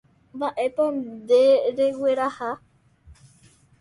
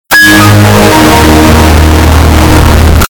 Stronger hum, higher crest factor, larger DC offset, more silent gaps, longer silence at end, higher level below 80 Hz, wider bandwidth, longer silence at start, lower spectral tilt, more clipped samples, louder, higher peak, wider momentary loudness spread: neither; first, 16 dB vs 2 dB; neither; neither; first, 0.7 s vs 0.1 s; second, -62 dBFS vs -12 dBFS; second, 11.5 kHz vs over 20 kHz; first, 0.35 s vs 0.1 s; about the same, -5 dB/octave vs -5 dB/octave; second, under 0.1% vs 30%; second, -22 LUFS vs -3 LUFS; second, -8 dBFS vs 0 dBFS; first, 14 LU vs 3 LU